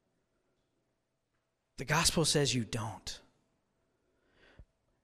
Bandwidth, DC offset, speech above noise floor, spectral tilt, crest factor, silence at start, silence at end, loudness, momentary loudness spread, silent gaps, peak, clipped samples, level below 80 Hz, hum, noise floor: 15.5 kHz; under 0.1%; 50 dB; -3 dB/octave; 24 dB; 1.8 s; 0.4 s; -31 LUFS; 18 LU; none; -14 dBFS; under 0.1%; -56 dBFS; none; -82 dBFS